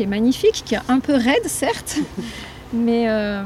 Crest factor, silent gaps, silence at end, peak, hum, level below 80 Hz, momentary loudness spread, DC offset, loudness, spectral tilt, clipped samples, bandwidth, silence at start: 14 dB; none; 0 s; -6 dBFS; none; -44 dBFS; 11 LU; under 0.1%; -19 LUFS; -4.5 dB/octave; under 0.1%; 15.5 kHz; 0 s